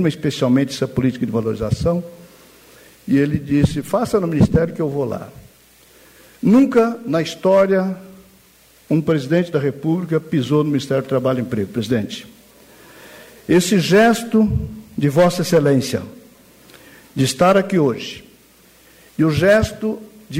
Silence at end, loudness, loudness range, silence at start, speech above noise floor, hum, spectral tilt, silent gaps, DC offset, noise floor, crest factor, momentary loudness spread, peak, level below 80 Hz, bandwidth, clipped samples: 0 s; -18 LUFS; 4 LU; 0 s; 34 dB; none; -6.5 dB/octave; none; under 0.1%; -51 dBFS; 14 dB; 13 LU; -4 dBFS; -42 dBFS; 16 kHz; under 0.1%